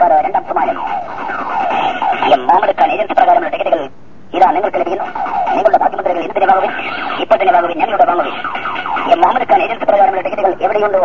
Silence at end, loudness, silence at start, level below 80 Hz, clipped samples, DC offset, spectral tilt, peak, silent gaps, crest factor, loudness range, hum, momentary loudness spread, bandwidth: 0 s; -14 LUFS; 0 s; -54 dBFS; under 0.1%; 3%; -5.5 dB/octave; 0 dBFS; none; 14 dB; 1 LU; none; 8 LU; 7 kHz